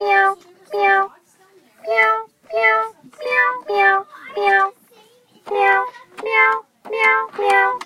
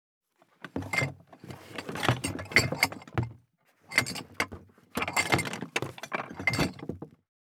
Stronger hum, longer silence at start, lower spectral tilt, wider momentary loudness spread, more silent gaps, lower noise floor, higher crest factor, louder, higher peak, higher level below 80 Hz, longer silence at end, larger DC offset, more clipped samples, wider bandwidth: neither; second, 0 s vs 0.65 s; second, -2 dB/octave vs -3.5 dB/octave; second, 13 LU vs 19 LU; neither; second, -53 dBFS vs -66 dBFS; second, 18 dB vs 30 dB; first, -17 LUFS vs -30 LUFS; about the same, -2 dBFS vs -2 dBFS; second, -68 dBFS vs -58 dBFS; second, 0 s vs 0.45 s; neither; neither; second, 15.5 kHz vs 19 kHz